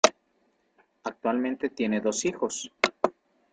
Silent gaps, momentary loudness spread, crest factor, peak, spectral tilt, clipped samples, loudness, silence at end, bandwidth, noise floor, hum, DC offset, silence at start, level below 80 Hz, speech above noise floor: none; 6 LU; 28 dB; 0 dBFS; -3 dB/octave; under 0.1%; -28 LUFS; 0.4 s; 9.6 kHz; -70 dBFS; none; under 0.1%; 0.05 s; -70 dBFS; 42 dB